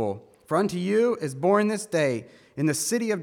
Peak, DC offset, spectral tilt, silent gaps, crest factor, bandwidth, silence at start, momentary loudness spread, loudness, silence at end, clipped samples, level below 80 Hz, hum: -8 dBFS; under 0.1%; -5 dB/octave; none; 18 dB; 18.5 kHz; 0 s; 9 LU; -25 LUFS; 0 s; under 0.1%; -70 dBFS; none